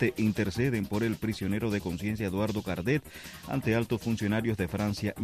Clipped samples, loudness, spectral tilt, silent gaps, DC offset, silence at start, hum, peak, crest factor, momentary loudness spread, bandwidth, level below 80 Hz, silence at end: under 0.1%; -30 LUFS; -6.5 dB/octave; none; under 0.1%; 0 s; none; -14 dBFS; 16 dB; 4 LU; 14.5 kHz; -52 dBFS; 0 s